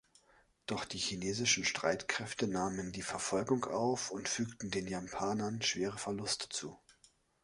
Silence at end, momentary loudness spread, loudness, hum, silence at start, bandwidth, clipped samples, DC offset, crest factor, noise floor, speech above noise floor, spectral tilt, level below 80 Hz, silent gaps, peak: 0.5 s; 9 LU; -36 LUFS; none; 0.7 s; 11.5 kHz; under 0.1%; under 0.1%; 22 dB; -69 dBFS; 32 dB; -3 dB/octave; -66 dBFS; none; -16 dBFS